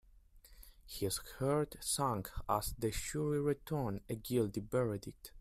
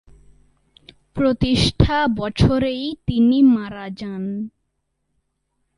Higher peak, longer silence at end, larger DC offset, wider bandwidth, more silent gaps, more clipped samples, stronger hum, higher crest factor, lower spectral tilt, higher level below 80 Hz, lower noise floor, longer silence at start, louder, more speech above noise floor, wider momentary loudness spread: second, -18 dBFS vs 0 dBFS; second, 0 s vs 1.3 s; neither; first, 16 kHz vs 11.5 kHz; neither; neither; neither; about the same, 20 dB vs 20 dB; second, -5 dB/octave vs -6.5 dB/octave; second, -54 dBFS vs -34 dBFS; second, -61 dBFS vs -72 dBFS; second, 0.15 s vs 1.15 s; second, -37 LUFS vs -19 LUFS; second, 24 dB vs 54 dB; second, 6 LU vs 15 LU